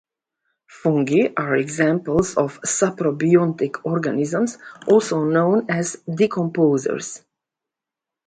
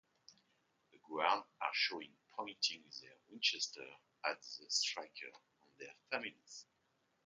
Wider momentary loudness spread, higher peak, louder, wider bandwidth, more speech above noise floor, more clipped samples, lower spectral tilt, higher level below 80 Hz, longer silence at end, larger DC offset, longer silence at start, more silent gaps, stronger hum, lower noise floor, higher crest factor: second, 8 LU vs 19 LU; first, -2 dBFS vs -18 dBFS; first, -20 LUFS vs -40 LUFS; about the same, 9.6 kHz vs 9.4 kHz; first, 67 dB vs 37 dB; neither; first, -6 dB/octave vs 0.5 dB/octave; first, -56 dBFS vs under -90 dBFS; first, 1.1 s vs 0.65 s; neither; first, 0.75 s vs 0.3 s; neither; neither; first, -87 dBFS vs -79 dBFS; second, 18 dB vs 26 dB